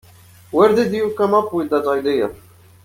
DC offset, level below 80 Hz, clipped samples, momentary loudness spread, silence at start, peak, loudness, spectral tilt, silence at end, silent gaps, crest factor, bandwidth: under 0.1%; -56 dBFS; under 0.1%; 7 LU; 0.5 s; -2 dBFS; -18 LUFS; -6.5 dB/octave; 0.5 s; none; 16 dB; 16 kHz